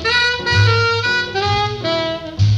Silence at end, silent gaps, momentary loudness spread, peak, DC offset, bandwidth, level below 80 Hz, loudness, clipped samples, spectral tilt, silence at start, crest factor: 0 s; none; 6 LU; -2 dBFS; under 0.1%; 8.2 kHz; -38 dBFS; -16 LUFS; under 0.1%; -4.5 dB/octave; 0 s; 14 dB